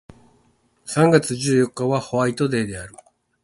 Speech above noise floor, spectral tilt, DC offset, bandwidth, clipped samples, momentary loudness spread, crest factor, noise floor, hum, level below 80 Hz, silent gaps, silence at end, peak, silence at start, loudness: 42 dB; -5.5 dB/octave; under 0.1%; 12 kHz; under 0.1%; 17 LU; 22 dB; -61 dBFS; none; -54 dBFS; none; 0.55 s; 0 dBFS; 0.85 s; -20 LUFS